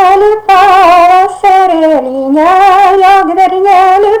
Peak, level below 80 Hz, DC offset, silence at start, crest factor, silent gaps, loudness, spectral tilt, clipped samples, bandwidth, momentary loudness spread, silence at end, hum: 0 dBFS; -40 dBFS; under 0.1%; 0 s; 4 dB; none; -5 LUFS; -3.5 dB/octave; 1%; 15 kHz; 5 LU; 0 s; none